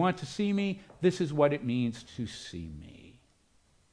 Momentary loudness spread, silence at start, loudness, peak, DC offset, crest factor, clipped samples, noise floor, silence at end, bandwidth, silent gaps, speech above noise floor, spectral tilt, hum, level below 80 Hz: 16 LU; 0 s; -31 LUFS; -12 dBFS; under 0.1%; 20 dB; under 0.1%; -67 dBFS; 0.8 s; 10.5 kHz; none; 36 dB; -6.5 dB/octave; none; -60 dBFS